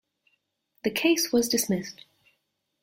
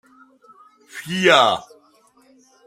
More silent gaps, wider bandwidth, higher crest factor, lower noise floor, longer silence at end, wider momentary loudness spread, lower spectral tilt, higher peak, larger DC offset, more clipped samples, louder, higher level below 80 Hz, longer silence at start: neither; about the same, 16.5 kHz vs 16 kHz; about the same, 18 dB vs 22 dB; first, -77 dBFS vs -56 dBFS; second, 0.9 s vs 1.05 s; second, 9 LU vs 22 LU; about the same, -3 dB/octave vs -3.5 dB/octave; second, -10 dBFS vs 0 dBFS; neither; neither; second, -25 LUFS vs -17 LUFS; about the same, -66 dBFS vs -68 dBFS; about the same, 0.85 s vs 0.95 s